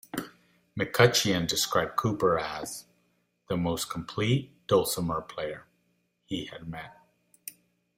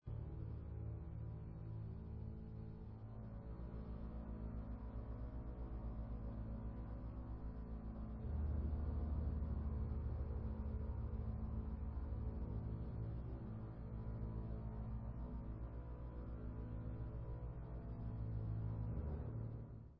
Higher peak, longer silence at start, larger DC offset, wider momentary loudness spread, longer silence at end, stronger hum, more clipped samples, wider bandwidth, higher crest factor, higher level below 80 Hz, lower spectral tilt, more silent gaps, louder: first, -4 dBFS vs -32 dBFS; about the same, 0.15 s vs 0.05 s; neither; first, 21 LU vs 7 LU; first, 0.5 s vs 0 s; neither; neither; first, 16 kHz vs 4.4 kHz; first, 26 dB vs 14 dB; second, -58 dBFS vs -48 dBFS; second, -4 dB/octave vs -11 dB/octave; neither; first, -28 LUFS vs -48 LUFS